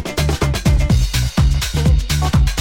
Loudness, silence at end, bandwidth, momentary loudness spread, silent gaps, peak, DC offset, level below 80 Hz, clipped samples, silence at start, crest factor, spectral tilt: -17 LUFS; 0 s; 17 kHz; 2 LU; none; -4 dBFS; under 0.1%; -18 dBFS; under 0.1%; 0 s; 12 dB; -5 dB/octave